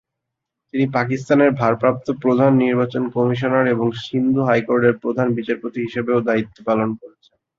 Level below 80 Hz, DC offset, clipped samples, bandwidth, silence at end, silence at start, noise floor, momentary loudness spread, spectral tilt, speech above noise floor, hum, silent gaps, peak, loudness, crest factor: -58 dBFS; under 0.1%; under 0.1%; 7.4 kHz; 0.5 s; 0.75 s; -81 dBFS; 8 LU; -8 dB/octave; 63 dB; none; none; -2 dBFS; -19 LUFS; 16 dB